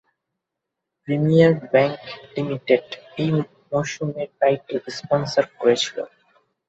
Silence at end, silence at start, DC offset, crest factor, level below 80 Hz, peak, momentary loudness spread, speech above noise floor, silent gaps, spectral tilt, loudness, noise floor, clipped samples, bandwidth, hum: 0.6 s; 1.05 s; under 0.1%; 20 dB; -62 dBFS; -2 dBFS; 15 LU; 62 dB; none; -6 dB/octave; -21 LUFS; -83 dBFS; under 0.1%; 8 kHz; none